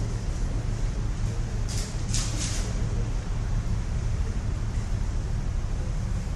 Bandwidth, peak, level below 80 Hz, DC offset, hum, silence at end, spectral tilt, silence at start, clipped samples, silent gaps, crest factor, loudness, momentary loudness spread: 12 kHz; -10 dBFS; -28 dBFS; under 0.1%; none; 0 s; -5 dB/octave; 0 s; under 0.1%; none; 18 dB; -30 LUFS; 3 LU